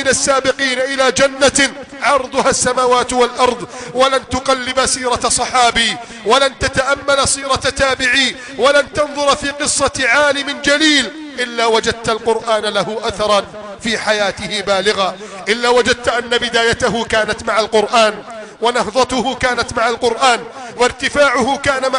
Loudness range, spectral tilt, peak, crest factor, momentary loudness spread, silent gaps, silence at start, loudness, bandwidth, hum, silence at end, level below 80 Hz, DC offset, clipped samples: 3 LU; -2 dB/octave; -2 dBFS; 12 dB; 6 LU; none; 0 s; -14 LUFS; 10.5 kHz; none; 0 s; -40 dBFS; under 0.1%; under 0.1%